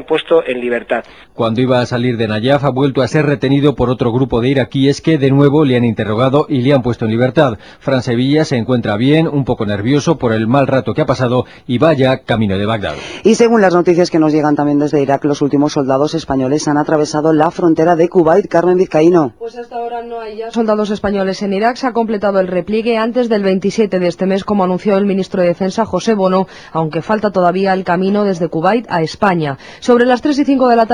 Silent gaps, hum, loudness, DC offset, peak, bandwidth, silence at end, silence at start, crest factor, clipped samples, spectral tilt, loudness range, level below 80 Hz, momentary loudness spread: none; none; -13 LUFS; 0.3%; 0 dBFS; 10.5 kHz; 0 s; 0 s; 12 dB; under 0.1%; -6.5 dB/octave; 3 LU; -44 dBFS; 7 LU